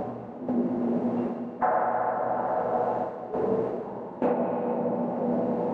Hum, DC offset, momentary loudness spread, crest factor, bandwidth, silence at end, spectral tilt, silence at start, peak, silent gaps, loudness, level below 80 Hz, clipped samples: none; under 0.1%; 6 LU; 14 dB; 4.5 kHz; 0 s; -10 dB/octave; 0 s; -12 dBFS; none; -28 LUFS; -64 dBFS; under 0.1%